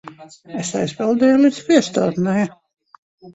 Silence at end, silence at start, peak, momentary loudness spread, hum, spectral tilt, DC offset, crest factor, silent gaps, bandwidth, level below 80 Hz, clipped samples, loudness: 0 s; 0.05 s; -2 dBFS; 12 LU; none; -5.5 dB/octave; under 0.1%; 18 dB; 2.98-3.18 s; 8.2 kHz; -60 dBFS; under 0.1%; -18 LUFS